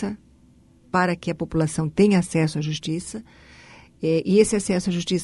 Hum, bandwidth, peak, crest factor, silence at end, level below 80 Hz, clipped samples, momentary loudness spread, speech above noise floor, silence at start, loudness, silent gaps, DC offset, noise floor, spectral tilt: none; 11.5 kHz; -4 dBFS; 18 dB; 0 s; -50 dBFS; under 0.1%; 12 LU; 32 dB; 0 s; -22 LUFS; none; under 0.1%; -54 dBFS; -5.5 dB/octave